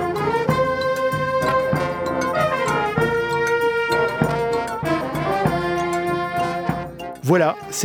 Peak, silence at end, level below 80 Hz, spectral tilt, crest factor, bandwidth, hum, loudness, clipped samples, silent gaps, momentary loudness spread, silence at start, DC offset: -2 dBFS; 0 s; -46 dBFS; -5.5 dB/octave; 18 dB; 19 kHz; none; -21 LUFS; under 0.1%; none; 4 LU; 0 s; under 0.1%